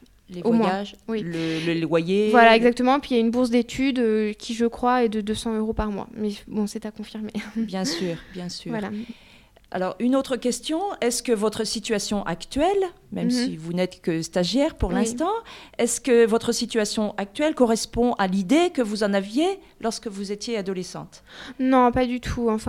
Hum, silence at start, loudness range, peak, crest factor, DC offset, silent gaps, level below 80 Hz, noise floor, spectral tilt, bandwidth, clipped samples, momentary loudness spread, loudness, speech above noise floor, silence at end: none; 0.3 s; 8 LU; -2 dBFS; 20 dB; under 0.1%; none; -46 dBFS; -52 dBFS; -4.5 dB/octave; 15.5 kHz; under 0.1%; 12 LU; -23 LUFS; 29 dB; 0 s